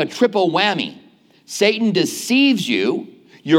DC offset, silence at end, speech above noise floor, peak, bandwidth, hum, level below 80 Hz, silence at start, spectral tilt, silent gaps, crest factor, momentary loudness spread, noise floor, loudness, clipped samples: under 0.1%; 0 s; 32 dB; -2 dBFS; 16.5 kHz; none; -74 dBFS; 0 s; -4 dB/octave; none; 16 dB; 13 LU; -50 dBFS; -17 LUFS; under 0.1%